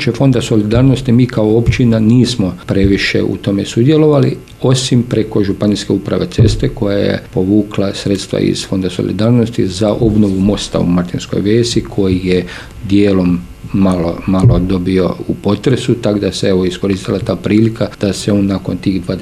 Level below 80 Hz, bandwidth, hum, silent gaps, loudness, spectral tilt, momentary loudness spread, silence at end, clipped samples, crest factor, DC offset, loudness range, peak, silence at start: -30 dBFS; 13 kHz; none; none; -13 LUFS; -6.5 dB/octave; 6 LU; 0 s; under 0.1%; 12 dB; under 0.1%; 3 LU; 0 dBFS; 0 s